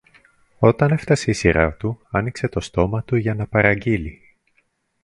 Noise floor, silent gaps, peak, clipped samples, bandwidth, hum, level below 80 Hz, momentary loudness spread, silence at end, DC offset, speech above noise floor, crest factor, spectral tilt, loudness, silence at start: -66 dBFS; none; 0 dBFS; under 0.1%; 11.5 kHz; none; -38 dBFS; 7 LU; 0.9 s; under 0.1%; 47 dB; 20 dB; -6.5 dB/octave; -20 LUFS; 0.6 s